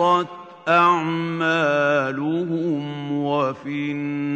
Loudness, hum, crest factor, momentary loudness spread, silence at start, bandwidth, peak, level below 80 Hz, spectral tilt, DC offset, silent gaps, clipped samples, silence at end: -21 LUFS; none; 16 dB; 10 LU; 0 s; 8.6 kHz; -4 dBFS; -72 dBFS; -6.5 dB/octave; under 0.1%; none; under 0.1%; 0 s